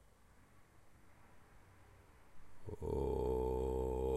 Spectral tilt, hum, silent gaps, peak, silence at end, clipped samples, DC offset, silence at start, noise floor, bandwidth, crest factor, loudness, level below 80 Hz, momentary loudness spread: -8.5 dB/octave; none; none; -26 dBFS; 0 s; under 0.1%; under 0.1%; 0.55 s; -66 dBFS; 13 kHz; 16 dB; -40 LUFS; -50 dBFS; 13 LU